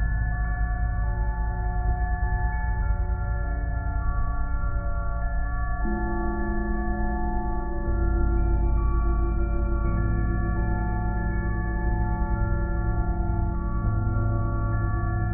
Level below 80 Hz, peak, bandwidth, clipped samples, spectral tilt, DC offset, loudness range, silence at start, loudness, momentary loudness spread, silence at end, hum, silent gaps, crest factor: -26 dBFS; -12 dBFS; 2.5 kHz; under 0.1%; -6 dB/octave; under 0.1%; 3 LU; 0 s; -28 LUFS; 4 LU; 0 s; none; none; 12 dB